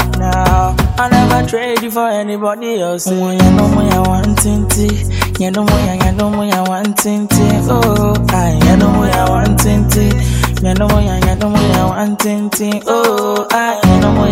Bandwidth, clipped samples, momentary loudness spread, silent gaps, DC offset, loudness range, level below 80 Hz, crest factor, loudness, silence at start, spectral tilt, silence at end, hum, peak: 16.5 kHz; under 0.1%; 6 LU; none; under 0.1%; 2 LU; -20 dBFS; 12 dB; -12 LUFS; 0 s; -5.5 dB/octave; 0 s; none; 0 dBFS